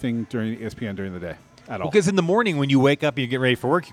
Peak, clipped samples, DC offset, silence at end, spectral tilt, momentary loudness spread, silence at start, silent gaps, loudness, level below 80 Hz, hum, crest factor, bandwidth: -6 dBFS; under 0.1%; under 0.1%; 0 s; -6 dB/octave; 15 LU; 0 s; none; -22 LUFS; -58 dBFS; none; 16 dB; 14.5 kHz